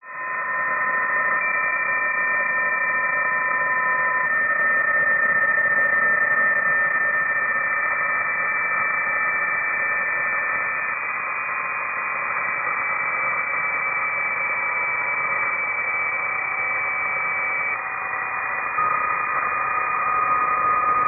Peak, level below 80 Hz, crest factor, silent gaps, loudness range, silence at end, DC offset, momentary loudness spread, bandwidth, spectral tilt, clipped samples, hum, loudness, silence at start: -10 dBFS; -62 dBFS; 12 dB; none; 4 LU; 0 s; under 0.1%; 6 LU; 2.9 kHz; 5 dB/octave; under 0.1%; none; -20 LUFS; 0.05 s